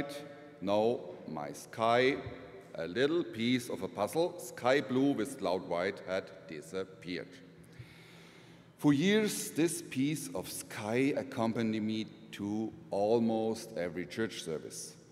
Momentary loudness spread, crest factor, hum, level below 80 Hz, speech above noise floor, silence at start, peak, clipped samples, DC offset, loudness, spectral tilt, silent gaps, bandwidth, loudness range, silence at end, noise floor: 17 LU; 20 dB; none; -72 dBFS; 23 dB; 0 s; -14 dBFS; under 0.1%; under 0.1%; -34 LUFS; -5 dB/octave; none; 16 kHz; 4 LU; 0.1 s; -57 dBFS